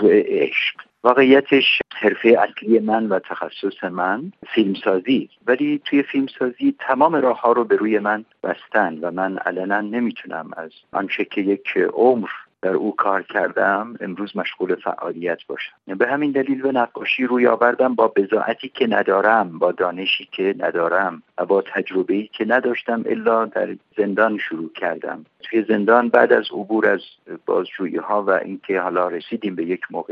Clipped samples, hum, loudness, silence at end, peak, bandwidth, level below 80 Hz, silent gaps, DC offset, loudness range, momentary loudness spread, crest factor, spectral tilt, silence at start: under 0.1%; none; -20 LUFS; 0 s; 0 dBFS; 5.8 kHz; -72 dBFS; none; under 0.1%; 5 LU; 11 LU; 18 dB; -7.5 dB/octave; 0 s